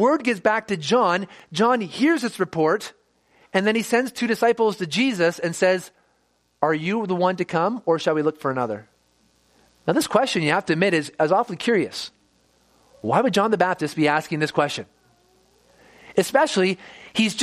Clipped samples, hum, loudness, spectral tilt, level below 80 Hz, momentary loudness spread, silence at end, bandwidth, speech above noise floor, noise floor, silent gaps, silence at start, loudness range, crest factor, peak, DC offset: under 0.1%; none; -22 LUFS; -4.5 dB/octave; -66 dBFS; 7 LU; 0 s; 15 kHz; 45 dB; -66 dBFS; none; 0 s; 2 LU; 20 dB; -2 dBFS; under 0.1%